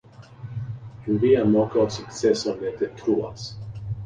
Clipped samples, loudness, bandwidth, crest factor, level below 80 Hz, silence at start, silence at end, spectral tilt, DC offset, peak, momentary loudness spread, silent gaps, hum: under 0.1%; -23 LUFS; 9.6 kHz; 18 dB; -50 dBFS; 0.2 s; 0 s; -6.5 dB/octave; under 0.1%; -6 dBFS; 17 LU; none; none